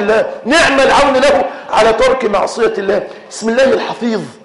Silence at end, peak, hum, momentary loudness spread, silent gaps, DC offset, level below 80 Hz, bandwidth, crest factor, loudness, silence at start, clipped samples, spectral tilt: 0.1 s; -2 dBFS; none; 9 LU; none; under 0.1%; -38 dBFS; 11.5 kHz; 10 dB; -12 LUFS; 0 s; under 0.1%; -3.5 dB/octave